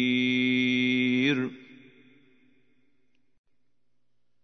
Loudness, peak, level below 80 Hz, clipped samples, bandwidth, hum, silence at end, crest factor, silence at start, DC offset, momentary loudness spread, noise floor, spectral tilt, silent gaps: -25 LUFS; -12 dBFS; -76 dBFS; under 0.1%; 6.2 kHz; 60 Hz at -65 dBFS; 2.8 s; 18 dB; 0 s; under 0.1%; 5 LU; -81 dBFS; -5.5 dB/octave; none